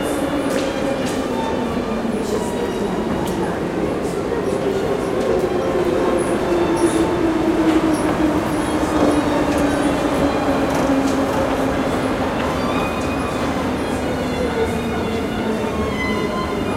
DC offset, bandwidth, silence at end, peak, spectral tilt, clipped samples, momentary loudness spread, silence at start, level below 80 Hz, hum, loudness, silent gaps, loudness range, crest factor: under 0.1%; 16 kHz; 0 s; -2 dBFS; -5.5 dB/octave; under 0.1%; 5 LU; 0 s; -36 dBFS; none; -19 LUFS; none; 4 LU; 16 dB